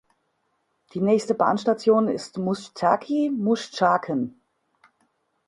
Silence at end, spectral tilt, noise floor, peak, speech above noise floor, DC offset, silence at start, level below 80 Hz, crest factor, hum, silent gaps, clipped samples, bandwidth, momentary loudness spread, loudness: 1.15 s; -6 dB/octave; -72 dBFS; -4 dBFS; 50 dB; under 0.1%; 0.95 s; -68 dBFS; 20 dB; none; none; under 0.1%; 11.5 kHz; 8 LU; -23 LUFS